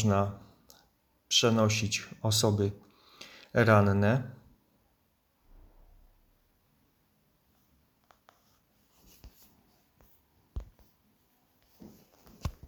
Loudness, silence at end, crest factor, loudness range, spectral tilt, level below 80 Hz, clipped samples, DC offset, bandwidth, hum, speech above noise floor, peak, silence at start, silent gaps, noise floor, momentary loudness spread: -27 LUFS; 0.15 s; 24 dB; 8 LU; -4.5 dB/octave; -56 dBFS; under 0.1%; under 0.1%; 18.5 kHz; none; 46 dB; -10 dBFS; 0 s; none; -72 dBFS; 26 LU